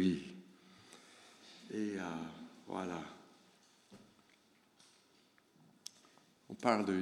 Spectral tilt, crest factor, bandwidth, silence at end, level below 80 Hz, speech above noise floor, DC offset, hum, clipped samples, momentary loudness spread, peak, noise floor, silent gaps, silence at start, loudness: -6 dB/octave; 28 dB; 14 kHz; 0 s; -80 dBFS; 33 dB; under 0.1%; none; under 0.1%; 27 LU; -14 dBFS; -70 dBFS; none; 0 s; -41 LUFS